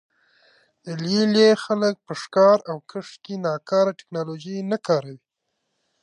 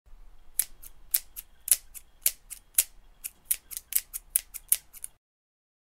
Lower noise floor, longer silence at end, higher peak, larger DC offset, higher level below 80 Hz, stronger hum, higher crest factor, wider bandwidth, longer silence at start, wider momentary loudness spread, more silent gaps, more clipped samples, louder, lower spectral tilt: first, -77 dBFS vs -48 dBFS; about the same, 0.85 s vs 0.9 s; second, -4 dBFS vs 0 dBFS; neither; second, -74 dBFS vs -56 dBFS; neither; second, 18 dB vs 34 dB; second, 10.5 kHz vs 16.5 kHz; first, 0.85 s vs 0.1 s; about the same, 18 LU vs 18 LU; neither; neither; first, -21 LUFS vs -28 LUFS; first, -5.5 dB/octave vs 3 dB/octave